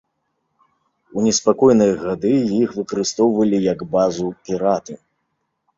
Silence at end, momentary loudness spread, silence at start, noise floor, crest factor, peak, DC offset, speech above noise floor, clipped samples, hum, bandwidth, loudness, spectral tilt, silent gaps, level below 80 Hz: 0.85 s; 10 LU; 1.15 s; -72 dBFS; 18 dB; -2 dBFS; under 0.1%; 55 dB; under 0.1%; none; 7.8 kHz; -18 LUFS; -5.5 dB/octave; none; -56 dBFS